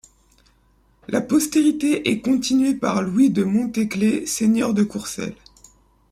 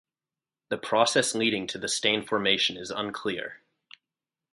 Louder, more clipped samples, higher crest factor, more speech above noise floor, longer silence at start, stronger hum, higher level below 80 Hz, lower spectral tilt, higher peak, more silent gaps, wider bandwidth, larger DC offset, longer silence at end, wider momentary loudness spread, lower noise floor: first, -20 LUFS vs -26 LUFS; neither; second, 16 dB vs 22 dB; second, 39 dB vs over 63 dB; first, 1.1 s vs 0.7 s; neither; first, -56 dBFS vs -68 dBFS; first, -5 dB/octave vs -2 dB/octave; about the same, -6 dBFS vs -6 dBFS; neither; first, 15.5 kHz vs 11.5 kHz; neither; second, 0.75 s vs 0.95 s; second, 8 LU vs 12 LU; second, -59 dBFS vs under -90 dBFS